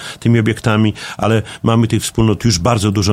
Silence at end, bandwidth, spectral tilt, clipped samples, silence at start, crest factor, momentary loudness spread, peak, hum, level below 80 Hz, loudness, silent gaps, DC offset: 0 s; 15 kHz; -5.5 dB/octave; under 0.1%; 0 s; 14 dB; 3 LU; 0 dBFS; none; -36 dBFS; -15 LUFS; none; under 0.1%